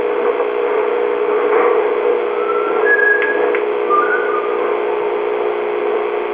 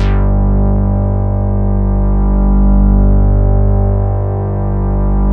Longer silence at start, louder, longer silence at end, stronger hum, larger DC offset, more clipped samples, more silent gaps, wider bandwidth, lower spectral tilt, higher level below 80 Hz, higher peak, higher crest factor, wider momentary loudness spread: about the same, 0 s vs 0 s; second, -16 LUFS vs -13 LUFS; about the same, 0 s vs 0 s; second, none vs 50 Hz at -20 dBFS; neither; neither; neither; first, 4 kHz vs 3.1 kHz; second, -7 dB/octave vs -11.5 dB/octave; second, -62 dBFS vs -12 dBFS; about the same, -2 dBFS vs 0 dBFS; about the same, 14 dB vs 10 dB; about the same, 5 LU vs 5 LU